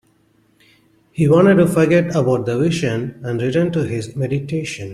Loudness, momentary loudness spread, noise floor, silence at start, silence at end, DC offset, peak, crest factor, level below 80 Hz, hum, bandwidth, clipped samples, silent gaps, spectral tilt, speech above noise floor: -17 LUFS; 12 LU; -58 dBFS; 1.15 s; 0 s; under 0.1%; -2 dBFS; 16 dB; -52 dBFS; none; 13.5 kHz; under 0.1%; none; -7 dB/octave; 41 dB